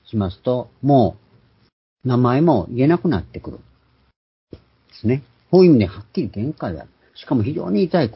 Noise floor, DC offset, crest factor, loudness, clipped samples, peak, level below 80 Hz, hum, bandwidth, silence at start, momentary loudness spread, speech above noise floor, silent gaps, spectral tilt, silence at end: -55 dBFS; under 0.1%; 18 dB; -19 LUFS; under 0.1%; -2 dBFS; -44 dBFS; none; 5.8 kHz; 0.15 s; 15 LU; 38 dB; 1.73-1.96 s, 4.16-4.47 s; -12.5 dB/octave; 0.05 s